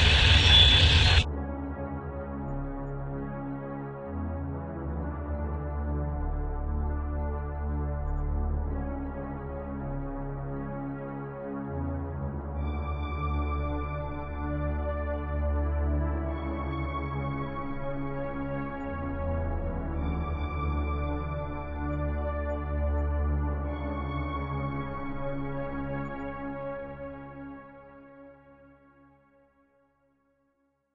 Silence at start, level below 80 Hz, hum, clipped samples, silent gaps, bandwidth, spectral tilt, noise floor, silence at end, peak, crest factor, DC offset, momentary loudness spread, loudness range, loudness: 0 s; -34 dBFS; none; under 0.1%; none; 9.6 kHz; -5.5 dB/octave; -73 dBFS; 2.3 s; -6 dBFS; 24 dB; under 0.1%; 7 LU; 5 LU; -30 LUFS